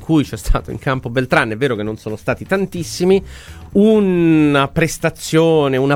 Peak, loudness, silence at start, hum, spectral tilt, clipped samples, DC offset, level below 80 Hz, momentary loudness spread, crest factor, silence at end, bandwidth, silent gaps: 0 dBFS; -16 LUFS; 0 s; none; -6 dB/octave; under 0.1%; under 0.1%; -30 dBFS; 10 LU; 16 dB; 0 s; 16.5 kHz; none